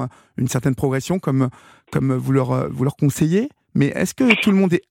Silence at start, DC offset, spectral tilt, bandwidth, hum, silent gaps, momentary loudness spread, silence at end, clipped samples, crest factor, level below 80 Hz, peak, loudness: 0 s; under 0.1%; -6.5 dB/octave; 17 kHz; none; none; 8 LU; 0.1 s; under 0.1%; 18 dB; -50 dBFS; 0 dBFS; -19 LUFS